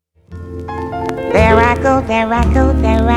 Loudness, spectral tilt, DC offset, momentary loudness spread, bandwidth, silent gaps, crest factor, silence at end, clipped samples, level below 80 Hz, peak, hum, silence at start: -13 LUFS; -7 dB/octave; under 0.1%; 16 LU; 10.5 kHz; none; 14 dB; 0 s; under 0.1%; -20 dBFS; 0 dBFS; none; 0.3 s